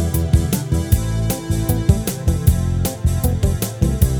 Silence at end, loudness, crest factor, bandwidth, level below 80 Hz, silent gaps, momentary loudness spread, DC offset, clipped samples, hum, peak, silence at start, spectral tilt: 0 s; -19 LUFS; 16 dB; over 20 kHz; -22 dBFS; none; 3 LU; under 0.1%; under 0.1%; none; -2 dBFS; 0 s; -6 dB/octave